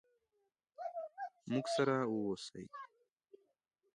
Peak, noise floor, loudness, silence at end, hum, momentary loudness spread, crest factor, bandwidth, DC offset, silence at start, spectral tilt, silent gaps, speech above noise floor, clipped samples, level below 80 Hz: -22 dBFS; -84 dBFS; -39 LUFS; 1.1 s; none; 17 LU; 20 dB; 11 kHz; under 0.1%; 0.8 s; -5.5 dB/octave; none; 47 dB; under 0.1%; -80 dBFS